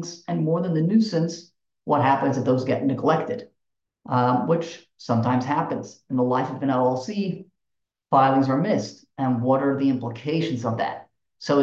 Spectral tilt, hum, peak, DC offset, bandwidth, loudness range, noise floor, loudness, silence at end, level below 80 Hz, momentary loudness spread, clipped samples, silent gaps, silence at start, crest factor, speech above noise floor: -7 dB/octave; none; -6 dBFS; under 0.1%; 7.6 kHz; 2 LU; -82 dBFS; -23 LUFS; 0 s; -66 dBFS; 11 LU; under 0.1%; none; 0 s; 18 dB; 60 dB